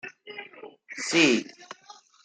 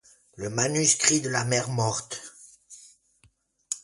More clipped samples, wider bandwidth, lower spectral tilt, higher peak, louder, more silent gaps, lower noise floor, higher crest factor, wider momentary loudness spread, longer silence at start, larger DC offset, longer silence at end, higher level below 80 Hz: neither; second, 9.4 kHz vs 11.5 kHz; about the same, -2.5 dB/octave vs -3 dB/octave; second, -8 dBFS vs -4 dBFS; about the same, -23 LUFS vs -24 LUFS; neither; second, -53 dBFS vs -65 dBFS; about the same, 20 dB vs 24 dB; first, 25 LU vs 18 LU; second, 0.05 s vs 0.35 s; neither; first, 0.3 s vs 0.05 s; second, -76 dBFS vs -62 dBFS